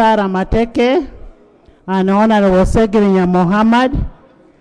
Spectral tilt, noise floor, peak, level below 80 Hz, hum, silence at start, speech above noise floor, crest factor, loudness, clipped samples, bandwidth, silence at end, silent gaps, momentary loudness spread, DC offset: -7.5 dB/octave; -46 dBFS; 0 dBFS; -28 dBFS; none; 0 s; 34 dB; 12 dB; -13 LUFS; under 0.1%; 10.5 kHz; 0.5 s; none; 10 LU; under 0.1%